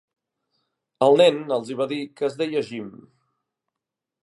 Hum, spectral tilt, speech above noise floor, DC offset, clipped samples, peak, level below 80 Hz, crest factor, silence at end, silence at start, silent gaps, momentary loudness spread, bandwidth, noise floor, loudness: none; -5.5 dB/octave; 65 dB; under 0.1%; under 0.1%; -4 dBFS; -76 dBFS; 20 dB; 1.35 s; 1 s; none; 17 LU; 11.5 kHz; -86 dBFS; -21 LUFS